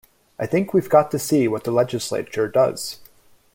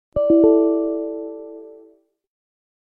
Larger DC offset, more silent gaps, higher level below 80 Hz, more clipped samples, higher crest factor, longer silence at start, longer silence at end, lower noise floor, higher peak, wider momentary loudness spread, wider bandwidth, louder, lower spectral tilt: neither; neither; second, -58 dBFS vs -50 dBFS; neither; about the same, 18 dB vs 18 dB; first, 0.4 s vs 0.15 s; second, 0.5 s vs 1.1 s; about the same, -52 dBFS vs -53 dBFS; about the same, -2 dBFS vs -4 dBFS; second, 13 LU vs 21 LU; first, 17 kHz vs 3.1 kHz; second, -21 LUFS vs -17 LUFS; second, -5.5 dB/octave vs -12 dB/octave